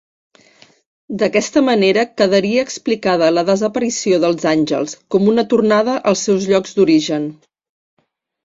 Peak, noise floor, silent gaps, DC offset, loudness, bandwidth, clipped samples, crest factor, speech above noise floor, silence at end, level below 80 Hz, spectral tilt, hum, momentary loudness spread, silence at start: 0 dBFS; -50 dBFS; none; under 0.1%; -15 LUFS; 7.8 kHz; under 0.1%; 16 dB; 35 dB; 1.1 s; -58 dBFS; -4.5 dB/octave; none; 6 LU; 1.1 s